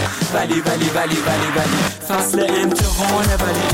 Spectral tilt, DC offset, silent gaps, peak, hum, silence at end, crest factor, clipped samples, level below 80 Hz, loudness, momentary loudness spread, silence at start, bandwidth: -4 dB/octave; 0.1%; none; -6 dBFS; none; 0 s; 10 dB; under 0.1%; -28 dBFS; -17 LUFS; 3 LU; 0 s; 17 kHz